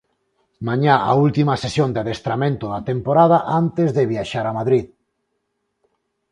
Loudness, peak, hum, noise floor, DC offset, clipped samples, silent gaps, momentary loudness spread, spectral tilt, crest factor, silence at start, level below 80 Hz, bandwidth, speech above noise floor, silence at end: -18 LUFS; 0 dBFS; none; -73 dBFS; under 0.1%; under 0.1%; none; 9 LU; -7.5 dB/octave; 20 dB; 0.6 s; -52 dBFS; 10.5 kHz; 55 dB; 1.45 s